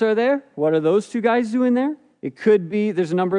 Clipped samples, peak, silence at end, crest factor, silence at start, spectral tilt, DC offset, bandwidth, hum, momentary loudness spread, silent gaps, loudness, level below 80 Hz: under 0.1%; -6 dBFS; 0 s; 14 dB; 0 s; -7 dB/octave; under 0.1%; 10.5 kHz; none; 5 LU; none; -20 LUFS; -74 dBFS